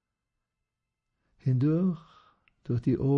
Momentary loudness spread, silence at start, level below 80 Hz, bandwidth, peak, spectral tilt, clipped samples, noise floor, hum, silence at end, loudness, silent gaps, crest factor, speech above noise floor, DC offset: 13 LU; 1.45 s; -58 dBFS; 5.6 kHz; -16 dBFS; -11.5 dB/octave; under 0.1%; -85 dBFS; none; 0 s; -29 LUFS; none; 16 dB; 60 dB; under 0.1%